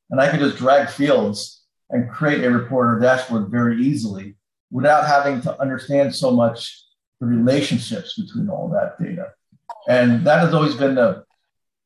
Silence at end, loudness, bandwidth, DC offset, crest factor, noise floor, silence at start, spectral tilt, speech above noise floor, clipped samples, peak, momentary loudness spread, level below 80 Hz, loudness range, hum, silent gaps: 0.65 s; -19 LUFS; 12 kHz; under 0.1%; 16 dB; -78 dBFS; 0.1 s; -6.5 dB/octave; 60 dB; under 0.1%; -4 dBFS; 13 LU; -60 dBFS; 3 LU; none; 4.60-4.68 s, 7.07-7.12 s